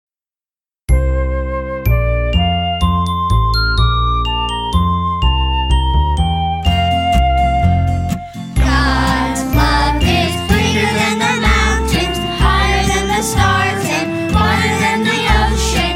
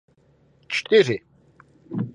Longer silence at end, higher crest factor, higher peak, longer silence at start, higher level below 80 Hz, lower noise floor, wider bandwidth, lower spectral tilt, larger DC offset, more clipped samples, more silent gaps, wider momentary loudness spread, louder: about the same, 0 s vs 0.05 s; second, 14 dB vs 20 dB; first, 0 dBFS vs -6 dBFS; first, 0.9 s vs 0.7 s; first, -18 dBFS vs -66 dBFS; first, under -90 dBFS vs -59 dBFS; first, 16 kHz vs 10 kHz; about the same, -5 dB/octave vs -5 dB/octave; neither; neither; neither; second, 4 LU vs 13 LU; first, -15 LUFS vs -21 LUFS